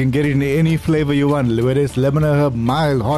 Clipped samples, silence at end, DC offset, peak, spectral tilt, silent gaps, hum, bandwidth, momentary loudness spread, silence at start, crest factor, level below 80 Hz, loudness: under 0.1%; 0 s; 0.5%; -6 dBFS; -7.5 dB/octave; none; none; 13 kHz; 2 LU; 0 s; 8 dB; -38 dBFS; -16 LUFS